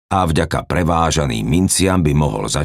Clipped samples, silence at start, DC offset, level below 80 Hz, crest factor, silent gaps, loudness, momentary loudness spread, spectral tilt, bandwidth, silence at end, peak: under 0.1%; 0.1 s; under 0.1%; -32 dBFS; 14 dB; none; -16 LUFS; 4 LU; -5 dB/octave; 16 kHz; 0 s; -2 dBFS